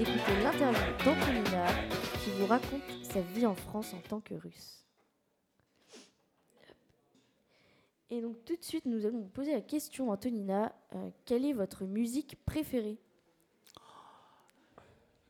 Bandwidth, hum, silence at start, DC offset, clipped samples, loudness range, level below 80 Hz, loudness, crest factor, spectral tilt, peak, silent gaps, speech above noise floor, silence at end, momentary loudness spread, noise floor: 19 kHz; none; 0 s; under 0.1%; under 0.1%; 15 LU; -54 dBFS; -34 LUFS; 22 dB; -5.5 dB/octave; -14 dBFS; none; 44 dB; 1.2 s; 13 LU; -78 dBFS